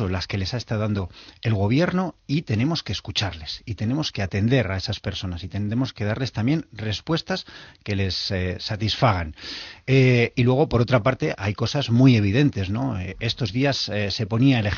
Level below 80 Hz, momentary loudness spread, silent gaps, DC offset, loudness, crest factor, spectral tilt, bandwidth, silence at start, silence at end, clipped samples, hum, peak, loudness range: -46 dBFS; 11 LU; none; under 0.1%; -23 LUFS; 20 dB; -5.5 dB/octave; 7 kHz; 0 s; 0 s; under 0.1%; none; -4 dBFS; 6 LU